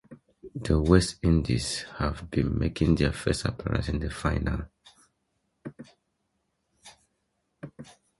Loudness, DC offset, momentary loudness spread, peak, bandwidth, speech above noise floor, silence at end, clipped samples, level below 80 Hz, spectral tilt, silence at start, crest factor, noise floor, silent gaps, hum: -27 LUFS; under 0.1%; 23 LU; -6 dBFS; 11.5 kHz; 51 dB; 0.35 s; under 0.1%; -38 dBFS; -6 dB/octave; 0.1 s; 22 dB; -77 dBFS; none; none